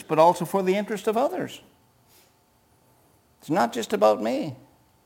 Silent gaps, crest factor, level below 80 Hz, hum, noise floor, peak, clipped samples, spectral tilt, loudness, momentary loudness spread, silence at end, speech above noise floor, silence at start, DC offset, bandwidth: none; 20 dB; -70 dBFS; none; -62 dBFS; -6 dBFS; under 0.1%; -5.5 dB/octave; -24 LUFS; 14 LU; 0.5 s; 39 dB; 0 s; under 0.1%; 17 kHz